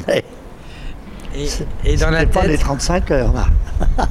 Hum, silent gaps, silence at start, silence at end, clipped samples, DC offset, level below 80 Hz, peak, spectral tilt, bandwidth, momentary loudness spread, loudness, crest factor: none; none; 0 s; 0 s; under 0.1%; under 0.1%; -18 dBFS; -4 dBFS; -5.5 dB/octave; 13 kHz; 19 LU; -18 LUFS; 12 dB